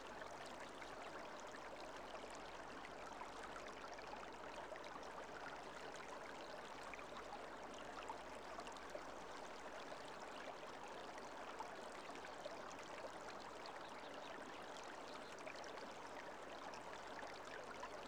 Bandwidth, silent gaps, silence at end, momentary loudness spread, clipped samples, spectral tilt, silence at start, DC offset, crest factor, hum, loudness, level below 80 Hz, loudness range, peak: over 20 kHz; none; 0 s; 1 LU; under 0.1%; -3 dB/octave; 0 s; under 0.1%; 16 dB; none; -53 LUFS; -74 dBFS; 0 LU; -36 dBFS